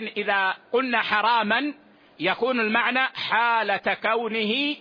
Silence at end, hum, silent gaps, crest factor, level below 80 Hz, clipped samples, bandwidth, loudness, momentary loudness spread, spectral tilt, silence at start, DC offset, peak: 0 s; none; none; 16 dB; -70 dBFS; under 0.1%; 5.2 kHz; -23 LUFS; 4 LU; -5.5 dB/octave; 0 s; under 0.1%; -8 dBFS